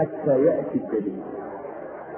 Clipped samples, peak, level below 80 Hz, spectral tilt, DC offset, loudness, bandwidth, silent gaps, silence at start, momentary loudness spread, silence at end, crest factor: under 0.1%; -8 dBFS; -62 dBFS; -13 dB/octave; under 0.1%; -25 LUFS; 3.2 kHz; none; 0 s; 15 LU; 0 s; 16 dB